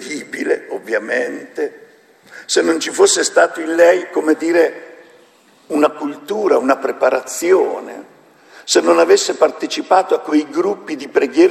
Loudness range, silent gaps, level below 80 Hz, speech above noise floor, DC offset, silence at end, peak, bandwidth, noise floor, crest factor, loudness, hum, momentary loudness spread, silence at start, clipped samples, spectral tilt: 3 LU; none; -68 dBFS; 35 dB; under 0.1%; 0 s; 0 dBFS; 13.5 kHz; -50 dBFS; 16 dB; -16 LUFS; none; 13 LU; 0 s; under 0.1%; -2 dB/octave